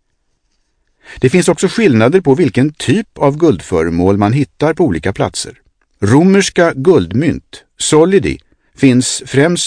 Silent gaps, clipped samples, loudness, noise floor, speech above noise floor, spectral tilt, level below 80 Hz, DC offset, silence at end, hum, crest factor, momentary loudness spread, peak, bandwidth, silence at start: none; 0.4%; -12 LUFS; -62 dBFS; 51 dB; -5.5 dB/octave; -40 dBFS; under 0.1%; 0 s; none; 12 dB; 8 LU; 0 dBFS; 10.5 kHz; 1.1 s